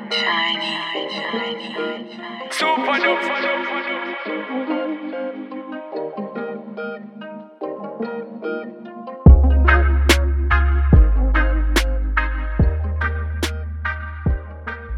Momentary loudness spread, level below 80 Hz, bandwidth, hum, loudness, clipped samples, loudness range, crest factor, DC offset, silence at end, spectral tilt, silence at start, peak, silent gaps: 16 LU; -22 dBFS; 14 kHz; none; -20 LUFS; under 0.1%; 13 LU; 18 dB; under 0.1%; 0 s; -5.5 dB/octave; 0 s; 0 dBFS; none